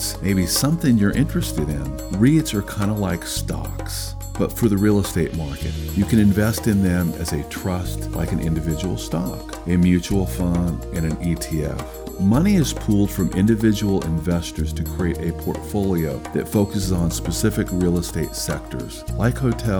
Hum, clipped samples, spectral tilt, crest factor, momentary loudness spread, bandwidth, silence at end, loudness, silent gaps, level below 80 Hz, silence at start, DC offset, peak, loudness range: none; under 0.1%; -6 dB/octave; 16 dB; 10 LU; over 20 kHz; 0 s; -21 LUFS; none; -32 dBFS; 0 s; under 0.1%; -4 dBFS; 3 LU